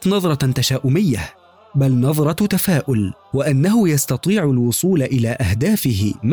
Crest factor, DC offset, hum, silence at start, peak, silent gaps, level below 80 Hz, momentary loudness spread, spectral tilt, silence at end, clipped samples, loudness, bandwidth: 8 dB; 0.1%; none; 0 s; -8 dBFS; none; -44 dBFS; 5 LU; -6 dB/octave; 0 s; under 0.1%; -17 LUFS; over 20 kHz